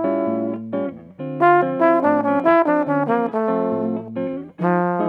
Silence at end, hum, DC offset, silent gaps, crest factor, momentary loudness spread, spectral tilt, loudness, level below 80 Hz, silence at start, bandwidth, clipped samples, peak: 0 s; none; under 0.1%; none; 18 dB; 11 LU; -9.5 dB/octave; -19 LUFS; -68 dBFS; 0 s; 5.2 kHz; under 0.1%; -2 dBFS